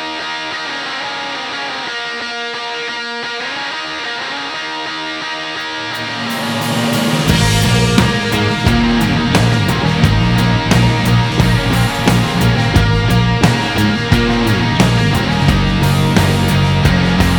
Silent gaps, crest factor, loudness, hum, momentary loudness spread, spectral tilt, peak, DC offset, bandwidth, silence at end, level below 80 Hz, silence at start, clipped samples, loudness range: none; 14 dB; -14 LUFS; none; 8 LU; -5 dB/octave; 0 dBFS; under 0.1%; 20 kHz; 0 s; -26 dBFS; 0 s; under 0.1%; 7 LU